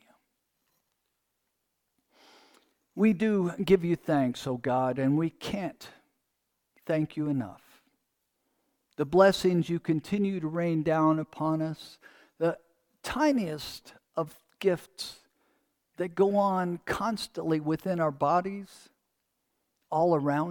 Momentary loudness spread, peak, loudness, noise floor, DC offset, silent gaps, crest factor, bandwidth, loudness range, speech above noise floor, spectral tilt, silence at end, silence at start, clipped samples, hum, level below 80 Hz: 15 LU; -8 dBFS; -28 LUFS; -80 dBFS; under 0.1%; none; 22 dB; 19 kHz; 6 LU; 53 dB; -6.5 dB/octave; 0 s; 2.95 s; under 0.1%; none; -62 dBFS